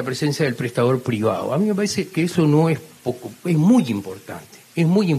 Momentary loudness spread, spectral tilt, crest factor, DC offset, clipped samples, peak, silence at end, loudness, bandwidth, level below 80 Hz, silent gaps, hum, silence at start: 13 LU; -6.5 dB/octave; 14 dB; under 0.1%; under 0.1%; -6 dBFS; 0 s; -20 LUFS; 14.5 kHz; -64 dBFS; none; none; 0 s